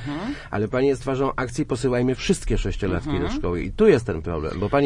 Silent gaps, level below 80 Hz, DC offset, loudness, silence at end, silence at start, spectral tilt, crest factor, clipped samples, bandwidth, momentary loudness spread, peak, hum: none; -34 dBFS; under 0.1%; -23 LUFS; 0 s; 0 s; -6.5 dB/octave; 18 dB; under 0.1%; 11.5 kHz; 9 LU; -4 dBFS; none